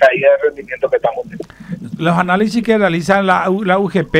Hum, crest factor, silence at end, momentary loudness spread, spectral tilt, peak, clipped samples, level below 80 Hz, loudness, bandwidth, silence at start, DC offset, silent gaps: none; 14 dB; 0 s; 15 LU; -6.5 dB/octave; 0 dBFS; under 0.1%; -46 dBFS; -14 LUFS; 14 kHz; 0 s; under 0.1%; none